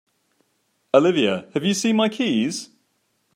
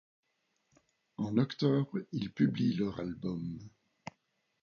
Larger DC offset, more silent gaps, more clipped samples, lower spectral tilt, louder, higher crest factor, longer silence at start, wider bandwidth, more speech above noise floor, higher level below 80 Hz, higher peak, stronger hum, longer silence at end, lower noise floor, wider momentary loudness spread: neither; neither; neither; second, -4.5 dB/octave vs -8 dB/octave; first, -20 LUFS vs -34 LUFS; about the same, 20 dB vs 20 dB; second, 0.95 s vs 1.2 s; first, 15.5 kHz vs 7.2 kHz; about the same, 49 dB vs 47 dB; about the same, -70 dBFS vs -66 dBFS; first, -2 dBFS vs -14 dBFS; neither; first, 0.7 s vs 0.55 s; second, -69 dBFS vs -79 dBFS; second, 7 LU vs 21 LU